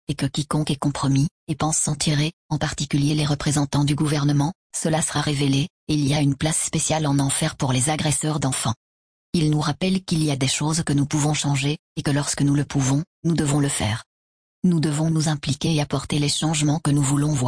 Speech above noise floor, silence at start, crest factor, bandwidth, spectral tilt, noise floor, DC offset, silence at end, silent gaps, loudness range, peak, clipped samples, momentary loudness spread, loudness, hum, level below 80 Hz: over 69 dB; 0.1 s; 12 dB; 10.5 kHz; -4.5 dB/octave; under -90 dBFS; under 0.1%; 0 s; 1.31-1.47 s, 2.33-2.49 s, 4.55-4.70 s, 5.70-5.87 s, 8.76-9.33 s, 11.79-11.95 s, 13.07-13.23 s, 14.06-14.62 s; 1 LU; -8 dBFS; under 0.1%; 4 LU; -22 LUFS; none; -46 dBFS